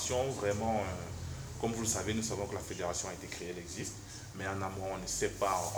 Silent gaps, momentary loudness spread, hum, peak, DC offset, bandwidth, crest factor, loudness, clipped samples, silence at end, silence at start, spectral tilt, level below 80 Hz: none; 9 LU; none; -18 dBFS; under 0.1%; over 20 kHz; 18 dB; -37 LUFS; under 0.1%; 0 s; 0 s; -4 dB/octave; -54 dBFS